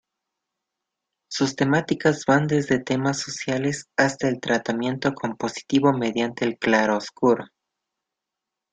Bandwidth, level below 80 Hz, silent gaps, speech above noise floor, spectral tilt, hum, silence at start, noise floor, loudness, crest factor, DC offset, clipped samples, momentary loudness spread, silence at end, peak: 9.4 kHz; -62 dBFS; none; 63 dB; -5 dB/octave; none; 1.3 s; -85 dBFS; -23 LUFS; 20 dB; under 0.1%; under 0.1%; 6 LU; 1.25 s; -4 dBFS